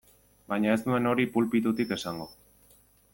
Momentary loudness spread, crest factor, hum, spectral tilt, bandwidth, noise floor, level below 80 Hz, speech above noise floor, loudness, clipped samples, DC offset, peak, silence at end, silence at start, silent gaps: 11 LU; 18 dB; 50 Hz at -55 dBFS; -6 dB/octave; 17 kHz; -61 dBFS; -62 dBFS; 34 dB; -28 LUFS; under 0.1%; under 0.1%; -12 dBFS; 0.8 s; 0.5 s; none